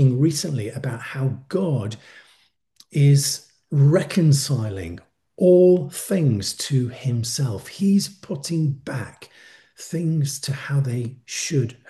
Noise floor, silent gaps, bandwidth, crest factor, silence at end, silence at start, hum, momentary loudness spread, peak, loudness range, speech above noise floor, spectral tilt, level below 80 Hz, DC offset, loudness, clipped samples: -61 dBFS; none; 12.5 kHz; 16 dB; 0.15 s; 0 s; none; 14 LU; -6 dBFS; 6 LU; 40 dB; -6 dB/octave; -58 dBFS; under 0.1%; -21 LUFS; under 0.1%